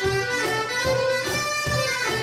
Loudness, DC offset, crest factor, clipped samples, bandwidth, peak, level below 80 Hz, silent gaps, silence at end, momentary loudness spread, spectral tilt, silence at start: -23 LUFS; under 0.1%; 12 dB; under 0.1%; 16 kHz; -12 dBFS; -48 dBFS; none; 0 s; 1 LU; -3 dB/octave; 0 s